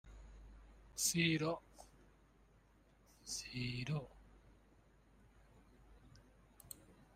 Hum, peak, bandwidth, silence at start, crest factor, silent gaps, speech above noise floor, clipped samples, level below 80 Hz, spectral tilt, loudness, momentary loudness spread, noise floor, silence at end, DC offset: none; -20 dBFS; 15.5 kHz; 0.05 s; 26 dB; none; 30 dB; under 0.1%; -64 dBFS; -3.5 dB/octave; -40 LUFS; 28 LU; -69 dBFS; 0.1 s; under 0.1%